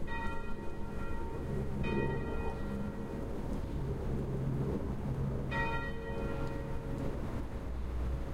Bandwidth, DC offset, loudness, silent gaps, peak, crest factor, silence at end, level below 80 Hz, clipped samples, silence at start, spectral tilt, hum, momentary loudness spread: 13 kHz; under 0.1%; -38 LUFS; none; -18 dBFS; 16 dB; 0 s; -40 dBFS; under 0.1%; 0 s; -8 dB/octave; none; 6 LU